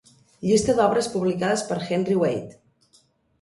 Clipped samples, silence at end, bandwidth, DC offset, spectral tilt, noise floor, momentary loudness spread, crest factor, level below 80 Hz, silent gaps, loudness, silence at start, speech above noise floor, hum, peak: under 0.1%; 0.9 s; 11.5 kHz; under 0.1%; -5 dB/octave; -61 dBFS; 9 LU; 16 dB; -54 dBFS; none; -23 LUFS; 0.4 s; 39 dB; none; -8 dBFS